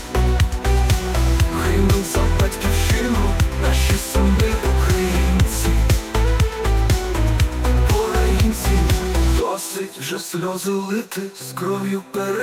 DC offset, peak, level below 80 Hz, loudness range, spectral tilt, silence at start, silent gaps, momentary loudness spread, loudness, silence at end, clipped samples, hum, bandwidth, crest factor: under 0.1%; -6 dBFS; -20 dBFS; 3 LU; -5.5 dB/octave; 0 s; none; 7 LU; -20 LUFS; 0 s; under 0.1%; none; 16.5 kHz; 12 dB